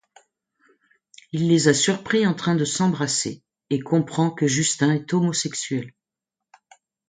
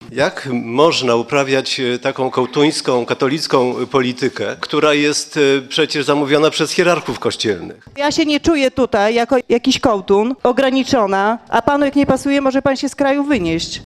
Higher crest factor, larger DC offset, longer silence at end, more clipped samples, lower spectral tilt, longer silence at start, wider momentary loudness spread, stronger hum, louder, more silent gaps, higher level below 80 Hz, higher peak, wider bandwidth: about the same, 20 dB vs 16 dB; neither; first, 1.2 s vs 0 s; neither; about the same, -4.5 dB/octave vs -4 dB/octave; first, 1.35 s vs 0 s; first, 11 LU vs 5 LU; neither; second, -22 LUFS vs -16 LUFS; neither; second, -64 dBFS vs -46 dBFS; about the same, -2 dBFS vs 0 dBFS; second, 9.6 kHz vs 13.5 kHz